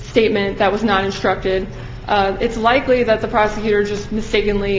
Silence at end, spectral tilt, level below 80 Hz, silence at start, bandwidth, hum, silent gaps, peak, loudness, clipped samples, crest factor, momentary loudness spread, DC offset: 0 s; -5.5 dB/octave; -34 dBFS; 0 s; 7.6 kHz; none; none; 0 dBFS; -17 LUFS; under 0.1%; 16 dB; 6 LU; under 0.1%